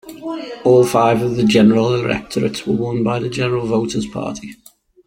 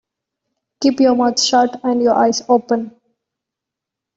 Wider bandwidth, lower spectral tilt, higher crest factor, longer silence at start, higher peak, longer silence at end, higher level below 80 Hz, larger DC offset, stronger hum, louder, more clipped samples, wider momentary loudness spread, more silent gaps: first, 16.5 kHz vs 8 kHz; first, -6 dB/octave vs -3 dB/octave; about the same, 16 dB vs 14 dB; second, 0.05 s vs 0.8 s; about the same, -2 dBFS vs -2 dBFS; second, 0.55 s vs 1.25 s; first, -48 dBFS vs -62 dBFS; neither; neither; about the same, -16 LUFS vs -15 LUFS; neither; first, 15 LU vs 7 LU; neither